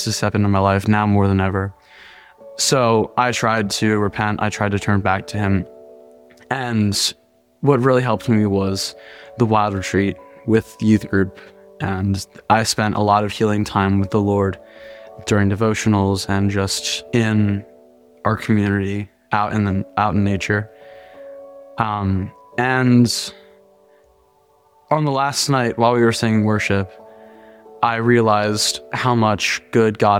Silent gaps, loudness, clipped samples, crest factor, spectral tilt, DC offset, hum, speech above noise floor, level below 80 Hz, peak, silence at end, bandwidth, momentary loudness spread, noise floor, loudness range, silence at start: none; -18 LUFS; under 0.1%; 16 dB; -5 dB/octave; under 0.1%; none; 39 dB; -50 dBFS; -2 dBFS; 0 s; 16 kHz; 9 LU; -56 dBFS; 3 LU; 0 s